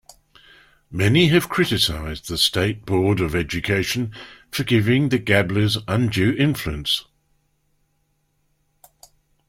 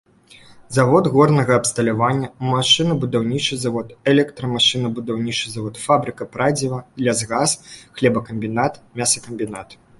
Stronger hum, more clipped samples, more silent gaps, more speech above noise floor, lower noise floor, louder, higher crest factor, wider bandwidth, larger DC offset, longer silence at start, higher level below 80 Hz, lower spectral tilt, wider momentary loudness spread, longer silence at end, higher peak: neither; neither; neither; first, 48 dB vs 28 dB; first, -68 dBFS vs -47 dBFS; about the same, -20 LUFS vs -19 LUFS; about the same, 20 dB vs 18 dB; first, 16.5 kHz vs 11.5 kHz; neither; first, 0.9 s vs 0.5 s; first, -44 dBFS vs -54 dBFS; about the same, -5 dB/octave vs -4 dB/octave; about the same, 10 LU vs 11 LU; first, 2.5 s vs 0.25 s; about the same, -2 dBFS vs -2 dBFS